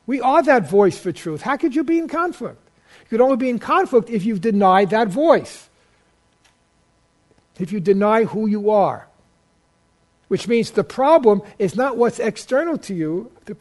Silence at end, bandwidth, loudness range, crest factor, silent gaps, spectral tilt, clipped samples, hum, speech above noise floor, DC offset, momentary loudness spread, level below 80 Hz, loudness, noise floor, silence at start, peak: 0.05 s; 11.5 kHz; 4 LU; 18 dB; none; -6.5 dB/octave; under 0.1%; none; 43 dB; under 0.1%; 12 LU; -60 dBFS; -18 LUFS; -61 dBFS; 0.1 s; 0 dBFS